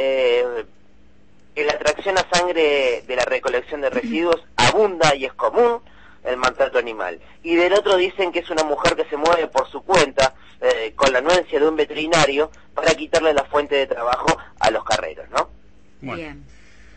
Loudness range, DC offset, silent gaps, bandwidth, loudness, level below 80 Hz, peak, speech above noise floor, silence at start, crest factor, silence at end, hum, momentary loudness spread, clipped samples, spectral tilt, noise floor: 2 LU; 0.6%; none; 8.8 kHz; -19 LUFS; -48 dBFS; -2 dBFS; 35 dB; 0 s; 18 dB; 0.55 s; none; 10 LU; under 0.1%; -3.5 dB/octave; -54 dBFS